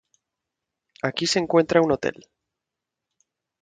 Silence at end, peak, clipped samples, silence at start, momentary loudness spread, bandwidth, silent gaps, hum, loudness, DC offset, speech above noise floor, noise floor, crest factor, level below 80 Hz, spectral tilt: 1.5 s; -4 dBFS; under 0.1%; 1.05 s; 11 LU; 9.4 kHz; none; none; -22 LUFS; under 0.1%; 64 dB; -85 dBFS; 22 dB; -60 dBFS; -4.5 dB/octave